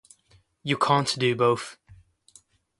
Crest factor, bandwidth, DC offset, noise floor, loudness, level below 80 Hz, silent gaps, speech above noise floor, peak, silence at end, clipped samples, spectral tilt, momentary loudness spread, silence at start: 22 dB; 11.5 kHz; under 0.1%; -62 dBFS; -24 LUFS; -64 dBFS; none; 38 dB; -6 dBFS; 0.85 s; under 0.1%; -4.5 dB/octave; 13 LU; 0.65 s